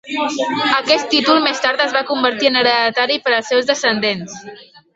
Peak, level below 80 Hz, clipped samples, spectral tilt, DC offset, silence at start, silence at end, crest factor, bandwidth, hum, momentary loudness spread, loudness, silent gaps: 0 dBFS; -62 dBFS; under 0.1%; -2.5 dB/octave; under 0.1%; 0.05 s; 0.3 s; 16 dB; 8 kHz; none; 6 LU; -15 LUFS; none